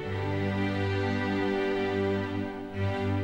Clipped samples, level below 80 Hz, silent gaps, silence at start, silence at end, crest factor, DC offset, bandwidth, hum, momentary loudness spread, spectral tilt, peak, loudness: under 0.1%; -56 dBFS; none; 0 s; 0 s; 12 dB; 0.2%; 8.4 kHz; none; 5 LU; -7.5 dB/octave; -18 dBFS; -30 LUFS